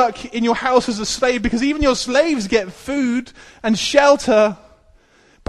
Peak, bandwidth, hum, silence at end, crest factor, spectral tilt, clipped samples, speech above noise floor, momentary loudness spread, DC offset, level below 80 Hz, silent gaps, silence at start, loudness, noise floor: 0 dBFS; 12.5 kHz; none; 0.95 s; 18 dB; -3.5 dB/octave; under 0.1%; 35 dB; 8 LU; under 0.1%; -40 dBFS; none; 0 s; -17 LUFS; -53 dBFS